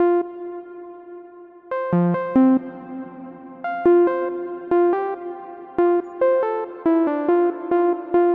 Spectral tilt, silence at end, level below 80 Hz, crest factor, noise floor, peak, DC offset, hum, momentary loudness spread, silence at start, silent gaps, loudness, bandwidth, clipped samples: -11 dB/octave; 0 s; -62 dBFS; 14 dB; -43 dBFS; -8 dBFS; under 0.1%; none; 20 LU; 0 s; none; -20 LUFS; 3.8 kHz; under 0.1%